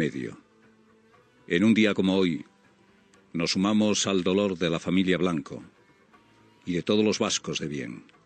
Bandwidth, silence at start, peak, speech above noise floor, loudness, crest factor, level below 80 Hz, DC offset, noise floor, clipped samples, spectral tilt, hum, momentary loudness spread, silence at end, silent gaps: 9.2 kHz; 0 s; -10 dBFS; 35 dB; -25 LUFS; 18 dB; -66 dBFS; under 0.1%; -60 dBFS; under 0.1%; -4.5 dB/octave; none; 15 LU; 0.25 s; none